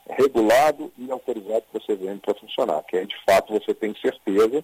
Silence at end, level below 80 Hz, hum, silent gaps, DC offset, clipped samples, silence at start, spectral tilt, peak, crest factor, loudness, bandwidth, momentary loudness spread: 0 s; -60 dBFS; none; none; under 0.1%; under 0.1%; 0.1 s; -4.5 dB/octave; -8 dBFS; 14 dB; -23 LUFS; 16 kHz; 12 LU